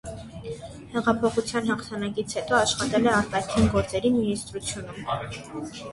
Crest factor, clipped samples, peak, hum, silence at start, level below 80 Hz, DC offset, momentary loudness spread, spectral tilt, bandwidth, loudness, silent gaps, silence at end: 18 dB; under 0.1%; -8 dBFS; none; 0.05 s; -44 dBFS; under 0.1%; 15 LU; -4.5 dB/octave; 11.5 kHz; -25 LUFS; none; 0 s